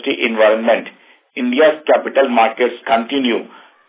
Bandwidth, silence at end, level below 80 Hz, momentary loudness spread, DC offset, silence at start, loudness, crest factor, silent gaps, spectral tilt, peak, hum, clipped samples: 4 kHz; 0.45 s; -68 dBFS; 9 LU; under 0.1%; 0.05 s; -15 LUFS; 14 dB; none; -7.5 dB/octave; 0 dBFS; none; under 0.1%